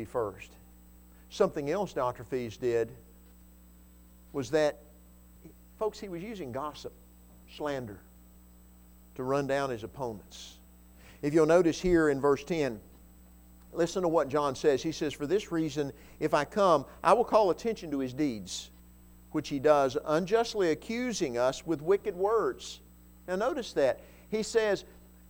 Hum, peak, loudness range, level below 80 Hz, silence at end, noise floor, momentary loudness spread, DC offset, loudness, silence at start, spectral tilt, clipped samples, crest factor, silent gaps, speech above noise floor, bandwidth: 60 Hz at -55 dBFS; -10 dBFS; 9 LU; -56 dBFS; 0.4 s; -55 dBFS; 16 LU; under 0.1%; -30 LUFS; 0 s; -5.5 dB/octave; under 0.1%; 22 dB; none; 26 dB; 19.5 kHz